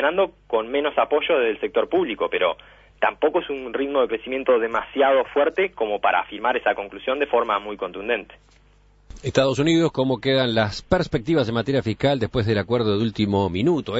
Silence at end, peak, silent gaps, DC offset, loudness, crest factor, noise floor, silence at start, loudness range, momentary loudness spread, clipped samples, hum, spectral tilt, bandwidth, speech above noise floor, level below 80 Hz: 0 s; -4 dBFS; none; under 0.1%; -22 LUFS; 18 dB; -55 dBFS; 0 s; 3 LU; 6 LU; under 0.1%; 50 Hz at -55 dBFS; -6 dB/octave; 8 kHz; 33 dB; -48 dBFS